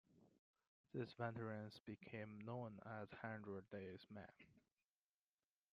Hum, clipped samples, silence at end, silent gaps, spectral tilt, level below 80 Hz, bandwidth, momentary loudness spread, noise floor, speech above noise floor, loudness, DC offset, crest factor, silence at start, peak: none; under 0.1%; 1.15 s; 0.39-0.54 s, 0.67-0.84 s, 1.80-1.85 s; -6 dB/octave; -86 dBFS; 7 kHz; 9 LU; under -90 dBFS; over 37 dB; -53 LUFS; under 0.1%; 22 dB; 0.1 s; -32 dBFS